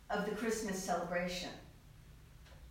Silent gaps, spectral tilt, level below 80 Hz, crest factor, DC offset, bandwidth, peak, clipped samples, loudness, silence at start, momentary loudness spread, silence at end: none; -4 dB/octave; -60 dBFS; 16 dB; under 0.1%; 16 kHz; -24 dBFS; under 0.1%; -39 LUFS; 0 s; 22 LU; 0 s